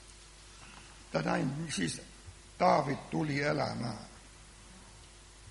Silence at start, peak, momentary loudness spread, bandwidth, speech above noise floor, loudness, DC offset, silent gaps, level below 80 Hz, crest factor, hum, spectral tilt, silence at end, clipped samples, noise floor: 0 s; -12 dBFS; 24 LU; 11.5 kHz; 22 dB; -33 LUFS; under 0.1%; none; -58 dBFS; 24 dB; none; -5 dB/octave; 0 s; under 0.1%; -54 dBFS